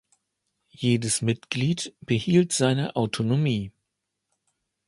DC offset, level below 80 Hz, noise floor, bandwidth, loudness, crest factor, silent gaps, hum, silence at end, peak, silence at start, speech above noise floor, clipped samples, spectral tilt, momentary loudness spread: under 0.1%; -58 dBFS; -81 dBFS; 11.5 kHz; -25 LUFS; 18 dB; none; none; 1.2 s; -8 dBFS; 0.8 s; 57 dB; under 0.1%; -5 dB/octave; 7 LU